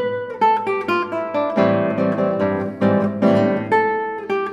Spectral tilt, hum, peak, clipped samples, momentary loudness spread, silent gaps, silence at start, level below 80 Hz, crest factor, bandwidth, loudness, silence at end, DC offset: -8 dB/octave; none; -4 dBFS; under 0.1%; 6 LU; none; 0 s; -66 dBFS; 16 dB; 8 kHz; -19 LUFS; 0 s; under 0.1%